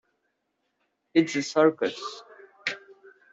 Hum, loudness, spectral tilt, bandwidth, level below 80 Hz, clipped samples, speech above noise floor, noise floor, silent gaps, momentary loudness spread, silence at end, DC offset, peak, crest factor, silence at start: none; -26 LUFS; -4.5 dB/octave; 7.8 kHz; -76 dBFS; under 0.1%; 53 dB; -77 dBFS; none; 17 LU; 0.55 s; under 0.1%; -8 dBFS; 20 dB; 1.15 s